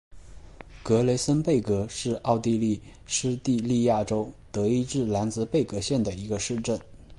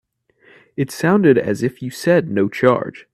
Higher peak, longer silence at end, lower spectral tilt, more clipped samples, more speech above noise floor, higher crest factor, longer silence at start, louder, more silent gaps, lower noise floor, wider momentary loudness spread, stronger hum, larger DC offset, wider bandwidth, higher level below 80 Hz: second, -8 dBFS vs 0 dBFS; second, 0 s vs 0.15 s; about the same, -5.5 dB/octave vs -6.5 dB/octave; neither; second, 20 dB vs 37 dB; about the same, 18 dB vs 18 dB; second, 0.1 s vs 0.8 s; second, -26 LUFS vs -17 LUFS; neither; second, -45 dBFS vs -54 dBFS; second, 7 LU vs 11 LU; neither; neither; second, 11.5 kHz vs 14 kHz; first, -50 dBFS vs -58 dBFS